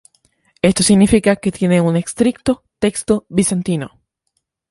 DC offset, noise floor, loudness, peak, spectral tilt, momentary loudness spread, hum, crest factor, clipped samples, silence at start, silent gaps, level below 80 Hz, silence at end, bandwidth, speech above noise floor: under 0.1%; -71 dBFS; -16 LUFS; 0 dBFS; -5 dB/octave; 9 LU; none; 16 dB; under 0.1%; 0.65 s; none; -40 dBFS; 0.85 s; 11.5 kHz; 56 dB